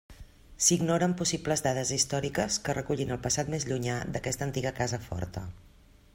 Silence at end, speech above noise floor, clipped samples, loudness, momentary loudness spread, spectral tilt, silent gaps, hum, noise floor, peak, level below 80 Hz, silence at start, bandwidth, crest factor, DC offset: 0.45 s; 20 dB; under 0.1%; -29 LUFS; 10 LU; -3.5 dB/octave; none; none; -50 dBFS; -10 dBFS; -52 dBFS; 0.1 s; 16 kHz; 20 dB; under 0.1%